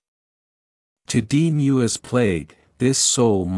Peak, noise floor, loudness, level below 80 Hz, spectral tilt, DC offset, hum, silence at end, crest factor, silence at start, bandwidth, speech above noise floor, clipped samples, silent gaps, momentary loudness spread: -4 dBFS; under -90 dBFS; -19 LUFS; -54 dBFS; -4.5 dB/octave; under 0.1%; none; 0 s; 16 dB; 1.1 s; 12 kHz; over 71 dB; under 0.1%; none; 8 LU